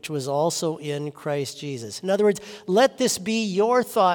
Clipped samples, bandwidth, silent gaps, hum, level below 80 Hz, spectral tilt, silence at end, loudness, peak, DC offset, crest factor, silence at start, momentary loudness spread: under 0.1%; 18 kHz; none; none; -70 dBFS; -4.5 dB/octave; 0 s; -24 LUFS; -8 dBFS; under 0.1%; 16 dB; 0.05 s; 11 LU